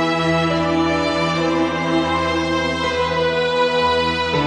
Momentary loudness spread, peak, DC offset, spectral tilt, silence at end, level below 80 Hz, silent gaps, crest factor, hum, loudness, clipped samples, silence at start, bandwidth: 2 LU; -6 dBFS; under 0.1%; -5 dB/octave; 0 s; -44 dBFS; none; 12 dB; none; -18 LUFS; under 0.1%; 0 s; 11 kHz